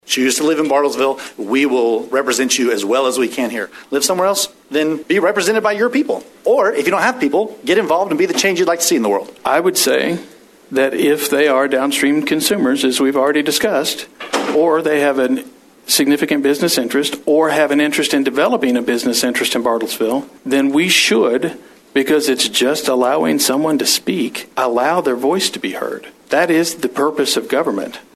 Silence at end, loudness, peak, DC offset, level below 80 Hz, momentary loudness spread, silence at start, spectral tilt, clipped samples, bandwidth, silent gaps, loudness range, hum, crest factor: 0.15 s; -15 LUFS; 0 dBFS; under 0.1%; -62 dBFS; 7 LU; 0.05 s; -2.5 dB/octave; under 0.1%; 14 kHz; none; 2 LU; none; 14 dB